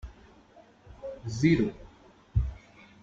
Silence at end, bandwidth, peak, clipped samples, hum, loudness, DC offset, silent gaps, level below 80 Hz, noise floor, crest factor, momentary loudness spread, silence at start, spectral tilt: 0.45 s; 7.8 kHz; -10 dBFS; under 0.1%; none; -29 LUFS; under 0.1%; none; -40 dBFS; -57 dBFS; 20 dB; 25 LU; 0.05 s; -7 dB/octave